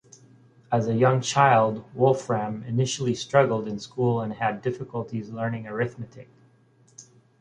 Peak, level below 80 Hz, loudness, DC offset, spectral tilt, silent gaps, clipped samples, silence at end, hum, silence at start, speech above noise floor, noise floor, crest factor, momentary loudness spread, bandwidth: -4 dBFS; -62 dBFS; -25 LUFS; under 0.1%; -5.5 dB/octave; none; under 0.1%; 0.4 s; none; 0.7 s; 35 dB; -59 dBFS; 22 dB; 12 LU; 9.8 kHz